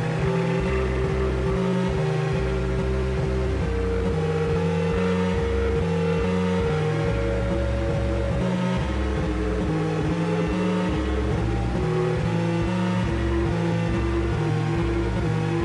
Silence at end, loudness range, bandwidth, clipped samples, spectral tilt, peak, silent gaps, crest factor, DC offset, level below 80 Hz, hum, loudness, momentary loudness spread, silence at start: 0 s; 1 LU; 11 kHz; under 0.1%; -7.5 dB/octave; -12 dBFS; none; 10 dB; under 0.1%; -30 dBFS; none; -24 LUFS; 2 LU; 0 s